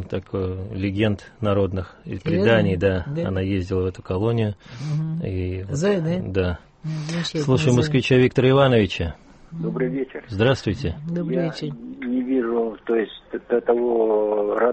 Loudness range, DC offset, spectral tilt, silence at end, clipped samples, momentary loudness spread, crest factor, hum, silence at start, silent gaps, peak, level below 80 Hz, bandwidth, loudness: 5 LU; under 0.1%; -7 dB/octave; 0 s; under 0.1%; 12 LU; 16 dB; none; 0 s; none; -6 dBFS; -46 dBFS; 8.4 kHz; -22 LUFS